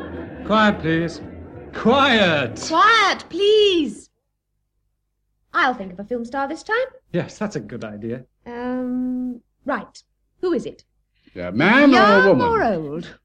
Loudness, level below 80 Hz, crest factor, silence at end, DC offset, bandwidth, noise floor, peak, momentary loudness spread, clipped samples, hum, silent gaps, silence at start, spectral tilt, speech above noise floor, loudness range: -18 LUFS; -50 dBFS; 16 dB; 0.1 s; under 0.1%; 10.5 kHz; -74 dBFS; -4 dBFS; 19 LU; under 0.1%; 50 Hz at -60 dBFS; none; 0 s; -5 dB/octave; 55 dB; 10 LU